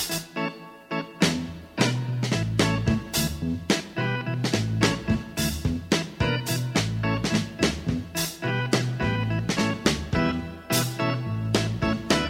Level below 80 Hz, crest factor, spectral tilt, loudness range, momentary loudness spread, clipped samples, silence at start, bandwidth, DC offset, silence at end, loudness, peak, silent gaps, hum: -42 dBFS; 20 dB; -4.5 dB/octave; 1 LU; 6 LU; under 0.1%; 0 s; 16.5 kHz; under 0.1%; 0 s; -26 LUFS; -6 dBFS; none; none